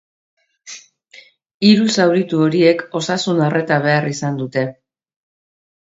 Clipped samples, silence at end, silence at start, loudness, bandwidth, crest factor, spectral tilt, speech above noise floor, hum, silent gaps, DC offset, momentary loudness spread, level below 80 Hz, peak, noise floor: under 0.1%; 1.2 s; 0.65 s; -16 LUFS; 8 kHz; 18 dB; -5.5 dB/octave; 31 dB; none; 1.54-1.60 s; under 0.1%; 16 LU; -64 dBFS; 0 dBFS; -46 dBFS